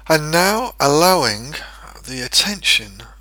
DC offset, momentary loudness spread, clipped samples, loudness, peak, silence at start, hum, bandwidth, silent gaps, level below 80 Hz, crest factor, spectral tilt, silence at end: under 0.1%; 19 LU; under 0.1%; -15 LUFS; 0 dBFS; 0.05 s; none; over 20 kHz; none; -42 dBFS; 18 dB; -2.5 dB/octave; 0.1 s